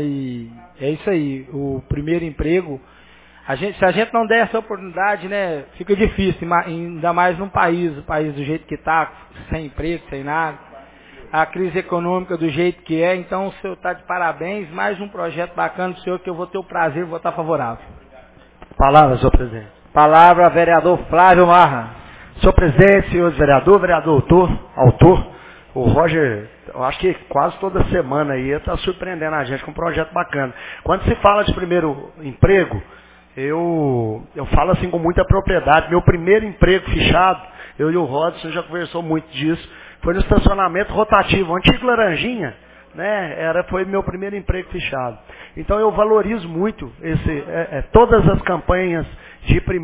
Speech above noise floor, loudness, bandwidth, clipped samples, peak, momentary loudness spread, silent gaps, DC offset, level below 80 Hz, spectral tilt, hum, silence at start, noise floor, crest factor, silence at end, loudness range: 30 dB; -17 LUFS; 4 kHz; under 0.1%; 0 dBFS; 14 LU; none; under 0.1%; -30 dBFS; -10.5 dB/octave; none; 0 s; -46 dBFS; 16 dB; 0 s; 10 LU